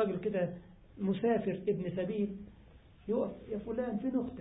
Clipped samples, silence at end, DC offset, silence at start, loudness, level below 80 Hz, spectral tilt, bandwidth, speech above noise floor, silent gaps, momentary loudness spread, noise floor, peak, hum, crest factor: under 0.1%; 0 s; under 0.1%; 0 s; -35 LUFS; -60 dBFS; -6 dB/octave; 3.9 kHz; 23 dB; none; 12 LU; -58 dBFS; -20 dBFS; none; 16 dB